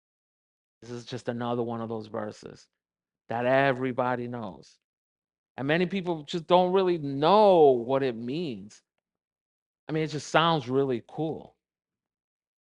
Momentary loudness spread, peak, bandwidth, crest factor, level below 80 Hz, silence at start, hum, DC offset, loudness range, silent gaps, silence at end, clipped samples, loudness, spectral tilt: 17 LU; -4 dBFS; 10.5 kHz; 24 dB; -68 dBFS; 0.8 s; none; under 0.1%; 7 LU; 4.84-5.22 s, 5.38-5.55 s, 9.27-9.31 s, 9.41-9.87 s; 1.3 s; under 0.1%; -26 LUFS; -6 dB/octave